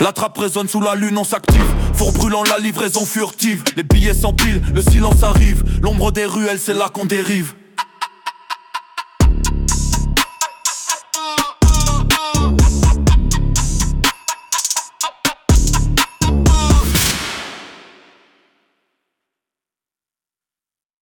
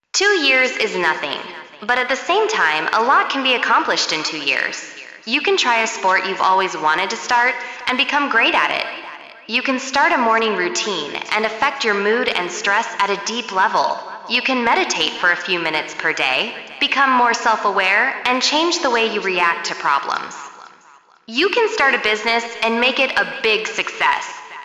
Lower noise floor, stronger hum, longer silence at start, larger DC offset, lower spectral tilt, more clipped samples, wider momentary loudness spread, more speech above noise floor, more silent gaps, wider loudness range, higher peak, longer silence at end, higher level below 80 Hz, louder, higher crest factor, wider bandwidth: first, under -90 dBFS vs -49 dBFS; neither; second, 0 s vs 0.15 s; neither; first, -4 dB/octave vs -1.5 dB/octave; neither; first, 11 LU vs 8 LU; first, over 76 dB vs 31 dB; neither; first, 5 LU vs 2 LU; about the same, 0 dBFS vs -2 dBFS; first, 3.25 s vs 0 s; first, -18 dBFS vs -64 dBFS; about the same, -16 LUFS vs -17 LUFS; about the same, 16 dB vs 18 dB; first, 19 kHz vs 12.5 kHz